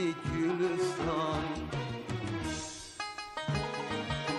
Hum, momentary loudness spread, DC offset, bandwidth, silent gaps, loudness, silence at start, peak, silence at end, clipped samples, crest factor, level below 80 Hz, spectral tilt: none; 8 LU; under 0.1%; 12 kHz; none; -34 LUFS; 0 s; -20 dBFS; 0 s; under 0.1%; 14 dB; -52 dBFS; -5 dB/octave